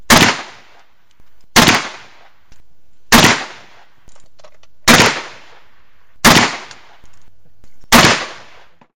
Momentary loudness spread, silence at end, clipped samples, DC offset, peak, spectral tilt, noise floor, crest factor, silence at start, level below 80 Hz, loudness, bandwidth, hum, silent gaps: 20 LU; 0.6 s; 0.2%; 2%; 0 dBFS; -2.5 dB/octave; -59 dBFS; 16 dB; 0.1 s; -38 dBFS; -11 LUFS; over 20 kHz; none; none